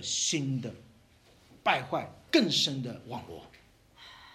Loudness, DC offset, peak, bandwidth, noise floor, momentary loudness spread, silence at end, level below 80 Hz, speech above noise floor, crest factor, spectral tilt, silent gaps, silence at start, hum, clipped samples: -29 LUFS; under 0.1%; -10 dBFS; 14.5 kHz; -61 dBFS; 22 LU; 0.05 s; -68 dBFS; 30 dB; 22 dB; -3 dB/octave; none; 0 s; none; under 0.1%